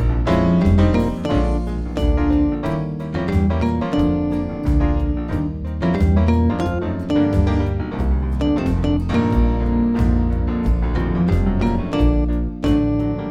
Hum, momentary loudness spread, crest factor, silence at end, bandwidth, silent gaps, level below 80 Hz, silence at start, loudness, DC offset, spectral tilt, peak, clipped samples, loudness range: none; 6 LU; 14 dB; 0 s; 8.6 kHz; none; -22 dBFS; 0 s; -19 LUFS; under 0.1%; -9 dB/octave; -4 dBFS; under 0.1%; 1 LU